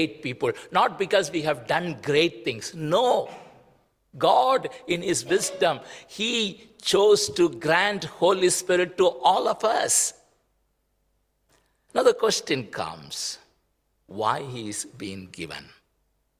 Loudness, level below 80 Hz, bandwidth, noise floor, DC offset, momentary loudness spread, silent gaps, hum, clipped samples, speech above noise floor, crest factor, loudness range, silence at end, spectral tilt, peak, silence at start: -24 LUFS; -64 dBFS; 16 kHz; -71 dBFS; under 0.1%; 13 LU; none; none; under 0.1%; 47 dB; 20 dB; 6 LU; 0.75 s; -3 dB/octave; -6 dBFS; 0 s